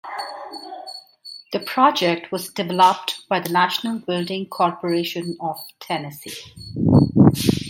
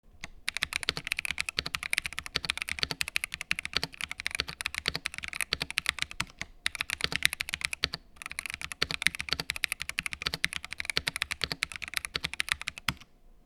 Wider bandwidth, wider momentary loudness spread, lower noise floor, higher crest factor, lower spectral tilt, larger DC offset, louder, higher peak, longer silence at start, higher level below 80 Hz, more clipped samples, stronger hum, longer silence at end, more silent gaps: second, 16.5 kHz vs 19.5 kHz; first, 19 LU vs 7 LU; second, -42 dBFS vs -55 dBFS; second, 20 dB vs 34 dB; first, -5.5 dB/octave vs -1 dB/octave; neither; first, -20 LUFS vs -32 LUFS; about the same, -2 dBFS vs 0 dBFS; about the same, 0.05 s vs 0.05 s; about the same, -52 dBFS vs -54 dBFS; neither; neither; second, 0 s vs 0.15 s; neither